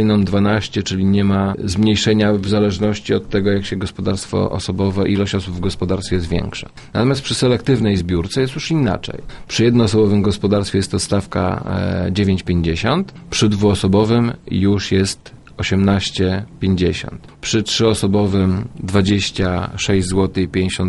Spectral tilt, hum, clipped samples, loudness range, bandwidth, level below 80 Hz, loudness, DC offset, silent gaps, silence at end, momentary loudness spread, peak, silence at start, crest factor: -6 dB/octave; none; under 0.1%; 3 LU; 11.5 kHz; -40 dBFS; -17 LUFS; under 0.1%; none; 0 s; 7 LU; -2 dBFS; 0 s; 14 dB